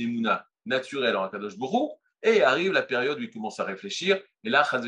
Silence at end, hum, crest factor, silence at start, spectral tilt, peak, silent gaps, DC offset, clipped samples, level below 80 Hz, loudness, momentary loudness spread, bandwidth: 0 s; none; 18 dB; 0 s; -4 dB/octave; -8 dBFS; none; under 0.1%; under 0.1%; -80 dBFS; -26 LUFS; 11 LU; 10.5 kHz